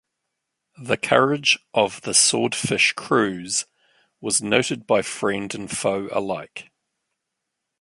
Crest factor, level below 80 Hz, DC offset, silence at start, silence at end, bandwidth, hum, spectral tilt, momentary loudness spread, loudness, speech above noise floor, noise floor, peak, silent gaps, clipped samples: 22 dB; -62 dBFS; under 0.1%; 0.8 s; 1.2 s; 11.5 kHz; none; -2.5 dB/octave; 12 LU; -21 LUFS; 59 dB; -81 dBFS; -2 dBFS; none; under 0.1%